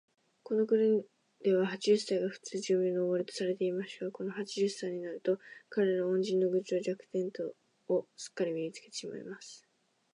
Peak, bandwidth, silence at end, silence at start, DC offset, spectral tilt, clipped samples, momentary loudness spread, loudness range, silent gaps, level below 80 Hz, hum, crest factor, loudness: -16 dBFS; 11 kHz; 0.55 s; 0.5 s; under 0.1%; -5.5 dB/octave; under 0.1%; 12 LU; 5 LU; none; -88 dBFS; none; 18 dB; -33 LUFS